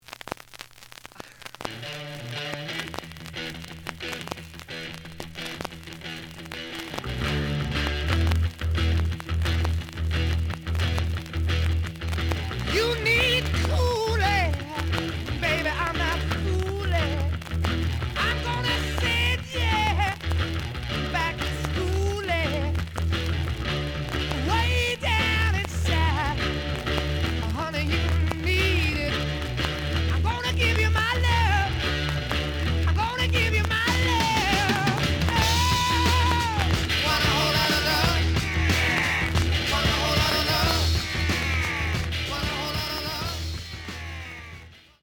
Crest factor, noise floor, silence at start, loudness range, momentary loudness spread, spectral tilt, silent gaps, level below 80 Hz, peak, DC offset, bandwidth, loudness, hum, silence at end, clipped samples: 18 dB; -46 dBFS; 0.1 s; 12 LU; 14 LU; -4.5 dB/octave; none; -34 dBFS; -6 dBFS; under 0.1%; 20 kHz; -25 LUFS; none; 0.25 s; under 0.1%